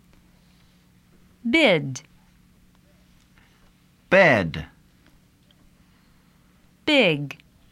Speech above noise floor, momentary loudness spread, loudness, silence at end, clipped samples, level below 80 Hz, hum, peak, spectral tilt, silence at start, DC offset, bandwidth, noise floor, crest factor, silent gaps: 38 dB; 21 LU; -20 LUFS; 0.45 s; under 0.1%; -56 dBFS; none; -4 dBFS; -5 dB/octave; 1.45 s; under 0.1%; 13 kHz; -57 dBFS; 22 dB; none